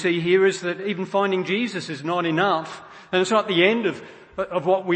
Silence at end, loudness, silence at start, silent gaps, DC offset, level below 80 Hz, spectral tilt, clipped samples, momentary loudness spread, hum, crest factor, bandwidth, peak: 0 s; -22 LUFS; 0 s; none; under 0.1%; -64 dBFS; -5 dB/octave; under 0.1%; 12 LU; none; 20 dB; 8.8 kHz; -2 dBFS